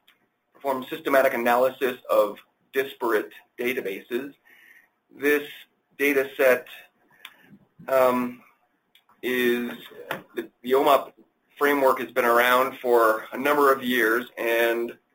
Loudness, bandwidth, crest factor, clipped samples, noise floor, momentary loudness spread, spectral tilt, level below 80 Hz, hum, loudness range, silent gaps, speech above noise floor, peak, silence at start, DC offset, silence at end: -23 LUFS; 17 kHz; 20 dB; under 0.1%; -64 dBFS; 14 LU; -3.5 dB/octave; -72 dBFS; none; 7 LU; none; 41 dB; -6 dBFS; 0.65 s; under 0.1%; 0.2 s